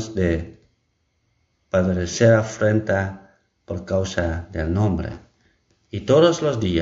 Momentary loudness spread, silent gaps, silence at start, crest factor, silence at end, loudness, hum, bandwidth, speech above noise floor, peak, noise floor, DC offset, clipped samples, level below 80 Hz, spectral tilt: 17 LU; none; 0 s; 18 dB; 0 s; -21 LUFS; none; 7.8 kHz; 49 dB; -4 dBFS; -69 dBFS; under 0.1%; under 0.1%; -40 dBFS; -6 dB/octave